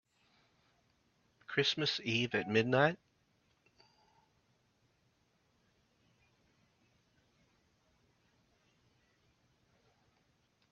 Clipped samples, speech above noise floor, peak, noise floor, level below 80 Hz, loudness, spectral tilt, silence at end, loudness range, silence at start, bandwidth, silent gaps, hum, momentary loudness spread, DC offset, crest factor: under 0.1%; 43 dB; -14 dBFS; -76 dBFS; -78 dBFS; -33 LUFS; -3 dB/octave; 7.75 s; 3 LU; 1.5 s; 7 kHz; none; none; 5 LU; under 0.1%; 28 dB